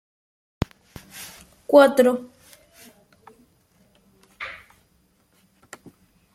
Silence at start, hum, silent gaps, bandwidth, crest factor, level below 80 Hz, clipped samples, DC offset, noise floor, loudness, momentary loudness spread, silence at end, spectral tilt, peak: 1.15 s; none; none; 15 kHz; 24 dB; -54 dBFS; under 0.1%; under 0.1%; -63 dBFS; -19 LUFS; 27 LU; 1.8 s; -5.5 dB/octave; -2 dBFS